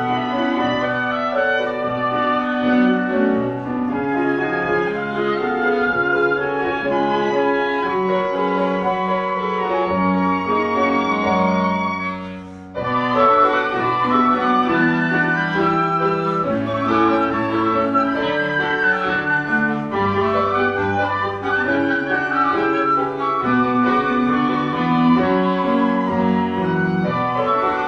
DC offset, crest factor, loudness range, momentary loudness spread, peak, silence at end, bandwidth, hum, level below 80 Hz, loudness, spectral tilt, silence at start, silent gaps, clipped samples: under 0.1%; 16 dB; 2 LU; 4 LU; -2 dBFS; 0 s; 7.2 kHz; none; -50 dBFS; -18 LUFS; -7.5 dB/octave; 0 s; none; under 0.1%